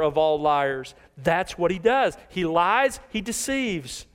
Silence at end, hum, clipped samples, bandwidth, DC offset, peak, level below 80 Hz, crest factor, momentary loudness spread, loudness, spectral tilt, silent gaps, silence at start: 0.1 s; none; under 0.1%; 16 kHz; under 0.1%; -6 dBFS; -50 dBFS; 16 dB; 9 LU; -24 LUFS; -4 dB/octave; none; 0 s